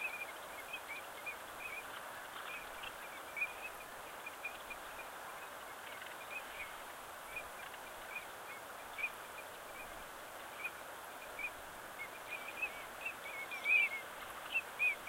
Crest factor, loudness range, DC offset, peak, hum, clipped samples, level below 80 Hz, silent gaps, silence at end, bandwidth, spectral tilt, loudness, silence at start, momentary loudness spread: 24 dB; 9 LU; under 0.1%; -22 dBFS; none; under 0.1%; -72 dBFS; none; 0 s; 16 kHz; -1 dB/octave; -42 LUFS; 0 s; 10 LU